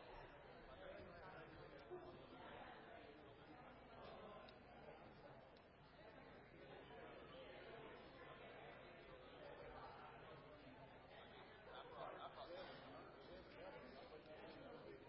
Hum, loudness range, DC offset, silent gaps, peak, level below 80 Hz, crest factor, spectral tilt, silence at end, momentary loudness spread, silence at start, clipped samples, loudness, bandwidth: none; 4 LU; under 0.1%; none; -42 dBFS; -76 dBFS; 18 dB; -3.5 dB/octave; 0 s; 6 LU; 0 s; under 0.1%; -60 LUFS; 5.6 kHz